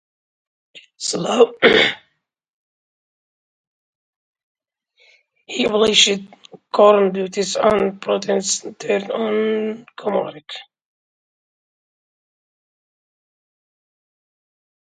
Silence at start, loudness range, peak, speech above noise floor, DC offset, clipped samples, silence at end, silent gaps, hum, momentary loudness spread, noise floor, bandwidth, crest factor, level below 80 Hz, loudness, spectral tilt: 0.75 s; 12 LU; 0 dBFS; 49 dB; under 0.1%; under 0.1%; 4.35 s; 2.53-4.34 s, 4.43-4.55 s; none; 15 LU; -67 dBFS; 10.5 kHz; 22 dB; -60 dBFS; -17 LUFS; -2.5 dB/octave